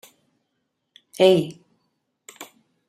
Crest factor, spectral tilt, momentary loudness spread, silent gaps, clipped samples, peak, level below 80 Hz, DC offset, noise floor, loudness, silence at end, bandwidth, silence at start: 22 dB; -5.5 dB/octave; 26 LU; none; under 0.1%; -4 dBFS; -72 dBFS; under 0.1%; -76 dBFS; -19 LUFS; 0.45 s; 15 kHz; 1.2 s